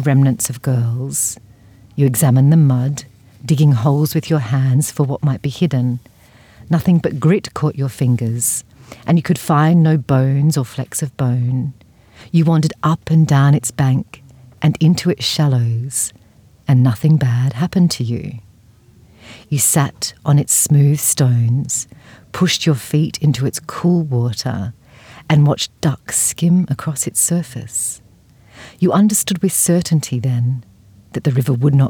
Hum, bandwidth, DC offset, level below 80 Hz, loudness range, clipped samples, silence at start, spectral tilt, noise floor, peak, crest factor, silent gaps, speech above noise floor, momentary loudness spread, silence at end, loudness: none; over 20 kHz; under 0.1%; -52 dBFS; 3 LU; under 0.1%; 0 s; -5.5 dB/octave; -48 dBFS; -2 dBFS; 14 dB; none; 33 dB; 10 LU; 0 s; -16 LUFS